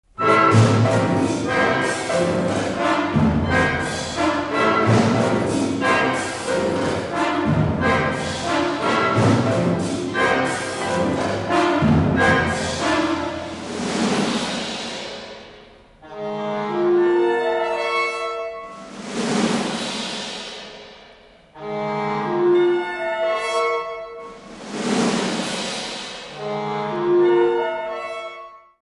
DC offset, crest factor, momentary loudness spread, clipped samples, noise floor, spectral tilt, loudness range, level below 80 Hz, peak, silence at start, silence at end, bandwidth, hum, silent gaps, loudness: under 0.1%; 18 dB; 14 LU; under 0.1%; -48 dBFS; -5.5 dB/octave; 6 LU; -42 dBFS; -2 dBFS; 0.2 s; 0.25 s; 11.5 kHz; none; none; -20 LUFS